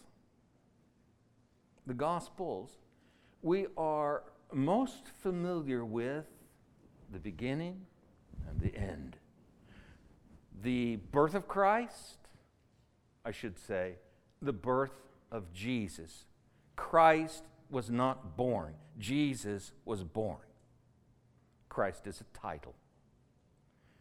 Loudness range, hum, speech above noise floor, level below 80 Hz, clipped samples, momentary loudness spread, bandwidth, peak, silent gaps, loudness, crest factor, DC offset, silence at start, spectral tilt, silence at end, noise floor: 10 LU; none; 35 dB; -56 dBFS; under 0.1%; 18 LU; 15.5 kHz; -12 dBFS; none; -36 LUFS; 24 dB; under 0.1%; 1.85 s; -6.5 dB/octave; 1.3 s; -69 dBFS